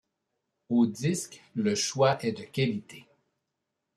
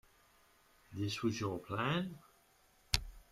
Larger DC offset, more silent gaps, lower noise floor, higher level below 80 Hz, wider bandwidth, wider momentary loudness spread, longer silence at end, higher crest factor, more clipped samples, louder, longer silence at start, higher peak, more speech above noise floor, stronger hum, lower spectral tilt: neither; neither; first, -84 dBFS vs -69 dBFS; second, -70 dBFS vs -54 dBFS; second, 14 kHz vs 15.5 kHz; about the same, 9 LU vs 10 LU; first, 0.95 s vs 0.1 s; second, 20 dB vs 34 dB; neither; first, -28 LUFS vs -38 LUFS; second, 0.7 s vs 0.9 s; second, -12 dBFS vs -6 dBFS; first, 56 dB vs 31 dB; neither; about the same, -5 dB/octave vs -4.5 dB/octave